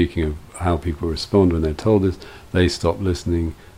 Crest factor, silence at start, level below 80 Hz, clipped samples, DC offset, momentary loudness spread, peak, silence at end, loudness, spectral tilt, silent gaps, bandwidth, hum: 18 dB; 0 s; -32 dBFS; under 0.1%; 0.2%; 8 LU; -2 dBFS; 0.25 s; -21 LUFS; -6.5 dB/octave; none; 14.5 kHz; none